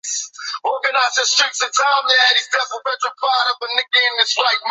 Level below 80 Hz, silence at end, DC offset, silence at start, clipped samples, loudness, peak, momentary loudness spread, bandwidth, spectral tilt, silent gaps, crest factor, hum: -84 dBFS; 0 s; under 0.1%; 0.05 s; under 0.1%; -16 LUFS; -2 dBFS; 10 LU; 8.4 kHz; 5 dB/octave; none; 16 dB; none